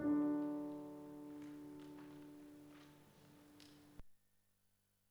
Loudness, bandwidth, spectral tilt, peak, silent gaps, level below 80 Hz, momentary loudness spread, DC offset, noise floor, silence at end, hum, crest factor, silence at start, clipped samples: -46 LUFS; 18.5 kHz; -7 dB/octave; -30 dBFS; none; -74 dBFS; 25 LU; under 0.1%; -80 dBFS; 0.95 s; 50 Hz at -80 dBFS; 18 dB; 0 s; under 0.1%